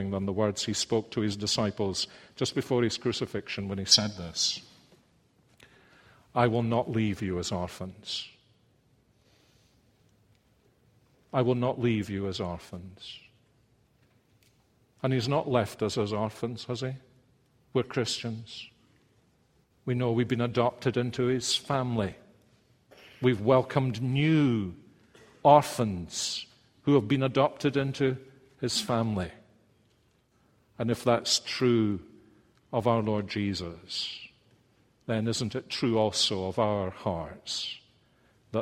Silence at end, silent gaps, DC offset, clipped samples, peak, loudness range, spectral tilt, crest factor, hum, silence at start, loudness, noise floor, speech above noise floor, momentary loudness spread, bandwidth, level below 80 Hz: 0 s; none; under 0.1%; under 0.1%; -6 dBFS; 8 LU; -5 dB/octave; 24 dB; none; 0 s; -29 LUFS; -67 dBFS; 39 dB; 13 LU; 16 kHz; -62 dBFS